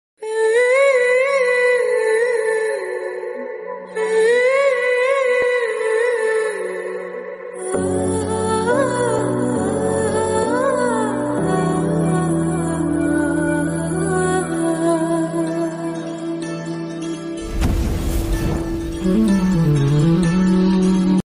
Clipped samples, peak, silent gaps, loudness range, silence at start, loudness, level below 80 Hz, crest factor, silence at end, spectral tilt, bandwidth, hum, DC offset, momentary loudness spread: under 0.1%; -6 dBFS; none; 5 LU; 0.2 s; -18 LUFS; -34 dBFS; 12 dB; 0.05 s; -6 dB/octave; 15.5 kHz; none; under 0.1%; 11 LU